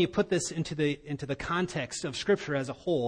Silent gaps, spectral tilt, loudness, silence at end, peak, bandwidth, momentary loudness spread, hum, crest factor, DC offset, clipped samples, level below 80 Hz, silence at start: none; -5 dB/octave; -31 LUFS; 0 s; -14 dBFS; 10.5 kHz; 6 LU; none; 16 dB; under 0.1%; under 0.1%; -56 dBFS; 0 s